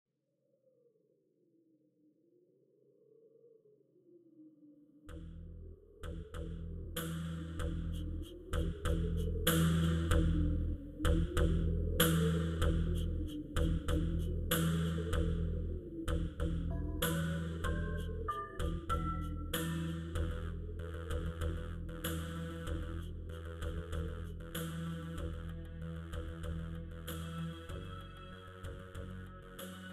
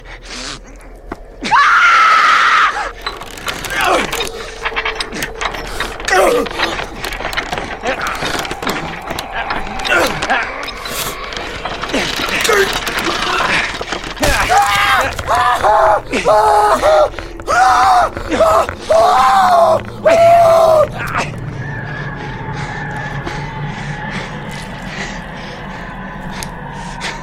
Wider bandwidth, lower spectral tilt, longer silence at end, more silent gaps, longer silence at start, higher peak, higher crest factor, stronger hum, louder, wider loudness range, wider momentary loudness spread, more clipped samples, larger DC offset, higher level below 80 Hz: about the same, 15.5 kHz vs 16.5 kHz; first, -5.5 dB/octave vs -3.5 dB/octave; about the same, 0 s vs 0 s; neither; first, 3.45 s vs 0 s; second, -14 dBFS vs 0 dBFS; first, 22 dB vs 14 dB; neither; second, -38 LUFS vs -14 LUFS; about the same, 12 LU vs 12 LU; about the same, 15 LU vs 16 LU; neither; neither; second, -42 dBFS vs -32 dBFS